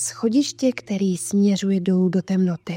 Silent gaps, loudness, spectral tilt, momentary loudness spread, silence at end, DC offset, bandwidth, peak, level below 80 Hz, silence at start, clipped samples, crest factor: none; -21 LUFS; -6 dB/octave; 4 LU; 0 s; under 0.1%; 16 kHz; -8 dBFS; -64 dBFS; 0 s; under 0.1%; 12 dB